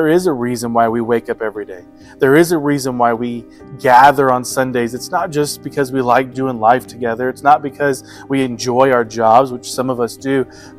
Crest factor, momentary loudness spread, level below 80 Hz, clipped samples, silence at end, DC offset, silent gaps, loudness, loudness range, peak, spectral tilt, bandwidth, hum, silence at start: 14 dB; 10 LU; -50 dBFS; 0.2%; 0.1 s; under 0.1%; none; -15 LUFS; 3 LU; 0 dBFS; -5 dB/octave; 15.5 kHz; none; 0 s